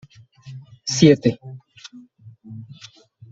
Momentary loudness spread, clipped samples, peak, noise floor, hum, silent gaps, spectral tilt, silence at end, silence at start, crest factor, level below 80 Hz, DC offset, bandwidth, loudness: 27 LU; under 0.1%; -2 dBFS; -47 dBFS; none; none; -5.5 dB/octave; 0.65 s; 0.45 s; 22 dB; -58 dBFS; under 0.1%; 8 kHz; -17 LUFS